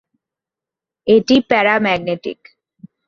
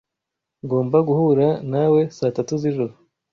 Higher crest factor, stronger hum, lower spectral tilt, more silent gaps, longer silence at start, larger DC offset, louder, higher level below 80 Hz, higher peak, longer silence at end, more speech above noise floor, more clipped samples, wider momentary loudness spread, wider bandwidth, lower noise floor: about the same, 18 dB vs 16 dB; neither; second, -5.5 dB/octave vs -8.5 dB/octave; neither; first, 1.05 s vs 0.65 s; neither; first, -15 LUFS vs -20 LUFS; first, -54 dBFS vs -60 dBFS; first, 0 dBFS vs -6 dBFS; second, 0.2 s vs 0.4 s; first, 72 dB vs 64 dB; neither; first, 13 LU vs 8 LU; about the same, 7.2 kHz vs 7.2 kHz; first, -87 dBFS vs -83 dBFS